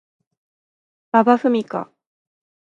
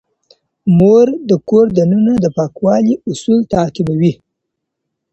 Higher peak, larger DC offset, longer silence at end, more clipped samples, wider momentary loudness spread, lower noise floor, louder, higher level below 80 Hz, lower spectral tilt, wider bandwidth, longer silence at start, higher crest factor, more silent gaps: about the same, 0 dBFS vs 0 dBFS; neither; second, 0.75 s vs 1 s; neither; first, 14 LU vs 8 LU; first, under -90 dBFS vs -75 dBFS; second, -18 LUFS vs -13 LUFS; second, -74 dBFS vs -46 dBFS; second, -7 dB/octave vs -8.5 dB/octave; second, 7.4 kHz vs 8.2 kHz; first, 1.15 s vs 0.65 s; first, 20 dB vs 12 dB; neither